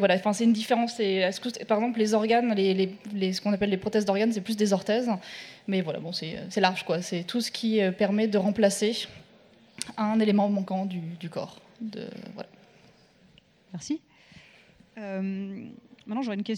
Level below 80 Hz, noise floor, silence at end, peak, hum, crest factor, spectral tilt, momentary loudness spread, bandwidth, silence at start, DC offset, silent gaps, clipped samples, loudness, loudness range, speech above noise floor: -68 dBFS; -59 dBFS; 0 s; -6 dBFS; none; 22 dB; -5 dB/octave; 16 LU; 14 kHz; 0 s; under 0.1%; none; under 0.1%; -27 LUFS; 13 LU; 33 dB